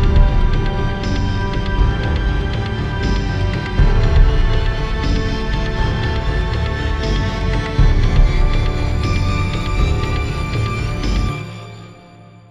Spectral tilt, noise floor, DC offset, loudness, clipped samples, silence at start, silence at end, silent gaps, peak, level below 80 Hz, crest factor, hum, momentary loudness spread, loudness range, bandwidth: -6.5 dB/octave; -41 dBFS; under 0.1%; -19 LUFS; under 0.1%; 0 s; 0.55 s; none; 0 dBFS; -18 dBFS; 16 dB; none; 5 LU; 2 LU; 9.2 kHz